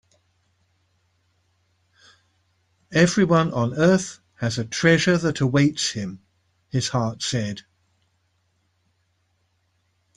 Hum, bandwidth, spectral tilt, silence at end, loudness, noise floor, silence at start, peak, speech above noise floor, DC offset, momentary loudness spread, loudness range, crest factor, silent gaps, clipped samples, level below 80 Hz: none; 10.5 kHz; -5 dB/octave; 2.55 s; -21 LUFS; -69 dBFS; 2.9 s; -2 dBFS; 48 dB; under 0.1%; 12 LU; 10 LU; 22 dB; none; under 0.1%; -56 dBFS